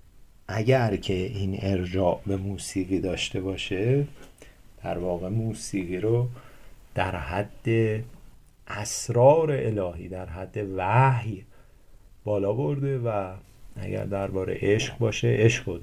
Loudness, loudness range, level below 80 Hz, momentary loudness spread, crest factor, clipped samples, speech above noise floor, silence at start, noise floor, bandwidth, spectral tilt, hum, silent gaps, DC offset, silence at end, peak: -26 LUFS; 5 LU; -46 dBFS; 14 LU; 20 dB; under 0.1%; 26 dB; 0.15 s; -51 dBFS; 14.5 kHz; -6 dB/octave; none; none; under 0.1%; 0 s; -6 dBFS